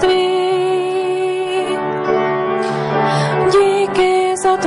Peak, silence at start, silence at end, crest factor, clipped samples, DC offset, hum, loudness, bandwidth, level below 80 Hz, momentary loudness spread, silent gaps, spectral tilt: -2 dBFS; 0 s; 0 s; 14 dB; under 0.1%; under 0.1%; none; -16 LUFS; 11.5 kHz; -50 dBFS; 5 LU; none; -5 dB/octave